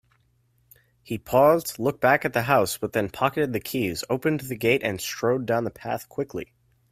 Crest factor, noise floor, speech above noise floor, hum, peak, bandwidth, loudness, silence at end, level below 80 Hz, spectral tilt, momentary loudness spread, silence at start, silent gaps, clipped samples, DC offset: 20 dB; -65 dBFS; 42 dB; none; -4 dBFS; 16 kHz; -24 LUFS; 0.5 s; -58 dBFS; -5 dB/octave; 12 LU; 1.05 s; none; under 0.1%; under 0.1%